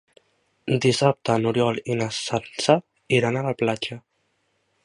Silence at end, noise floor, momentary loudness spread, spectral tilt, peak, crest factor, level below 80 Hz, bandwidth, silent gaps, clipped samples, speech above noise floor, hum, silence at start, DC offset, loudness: 0.85 s; -70 dBFS; 8 LU; -5 dB/octave; -2 dBFS; 22 dB; -60 dBFS; 11.5 kHz; none; under 0.1%; 48 dB; none; 0.65 s; under 0.1%; -23 LUFS